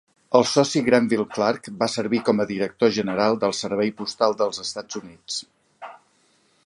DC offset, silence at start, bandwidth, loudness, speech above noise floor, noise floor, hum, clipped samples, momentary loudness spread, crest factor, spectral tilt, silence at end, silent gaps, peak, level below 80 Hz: under 0.1%; 0.3 s; 11 kHz; -22 LUFS; 41 dB; -62 dBFS; none; under 0.1%; 14 LU; 22 dB; -4.5 dB/octave; 0.75 s; none; -2 dBFS; -64 dBFS